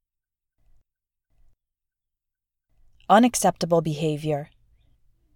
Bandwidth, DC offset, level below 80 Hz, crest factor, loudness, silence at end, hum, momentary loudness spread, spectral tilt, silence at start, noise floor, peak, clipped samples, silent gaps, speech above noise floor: 18.5 kHz; under 0.1%; -58 dBFS; 22 dB; -22 LUFS; 0.9 s; none; 11 LU; -5 dB/octave; 3.1 s; -86 dBFS; -4 dBFS; under 0.1%; none; 65 dB